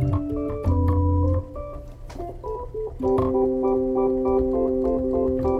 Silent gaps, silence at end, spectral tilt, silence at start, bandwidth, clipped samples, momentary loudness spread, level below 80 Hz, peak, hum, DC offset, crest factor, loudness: none; 0 s; -11 dB/octave; 0 s; 4.7 kHz; under 0.1%; 15 LU; -34 dBFS; -10 dBFS; none; under 0.1%; 12 dB; -23 LUFS